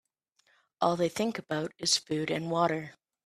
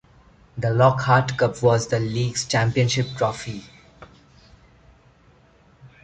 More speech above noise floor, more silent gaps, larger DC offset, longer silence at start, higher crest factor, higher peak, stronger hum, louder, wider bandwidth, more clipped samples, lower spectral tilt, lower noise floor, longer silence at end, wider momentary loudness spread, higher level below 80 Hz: first, 42 dB vs 35 dB; neither; neither; first, 0.8 s vs 0.55 s; about the same, 20 dB vs 20 dB; second, -12 dBFS vs -4 dBFS; neither; second, -30 LUFS vs -21 LUFS; first, 14.5 kHz vs 9.2 kHz; neither; second, -3.5 dB/octave vs -5 dB/octave; first, -72 dBFS vs -55 dBFS; first, 0.35 s vs 0.15 s; second, 7 LU vs 13 LU; second, -72 dBFS vs -52 dBFS